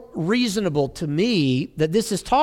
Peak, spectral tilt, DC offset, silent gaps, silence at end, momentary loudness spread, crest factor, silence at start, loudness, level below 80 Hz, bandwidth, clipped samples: -6 dBFS; -5.5 dB/octave; under 0.1%; none; 0 s; 4 LU; 14 dB; 0 s; -22 LUFS; -48 dBFS; 17 kHz; under 0.1%